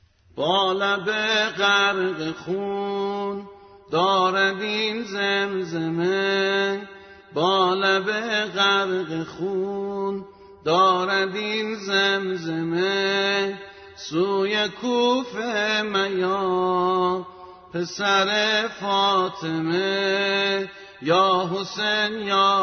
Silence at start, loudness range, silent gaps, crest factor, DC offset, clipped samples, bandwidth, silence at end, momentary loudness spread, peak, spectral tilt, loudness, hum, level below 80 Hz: 0.35 s; 2 LU; none; 16 dB; under 0.1%; under 0.1%; 6.6 kHz; 0 s; 10 LU; -8 dBFS; -4 dB/octave; -22 LUFS; none; -64 dBFS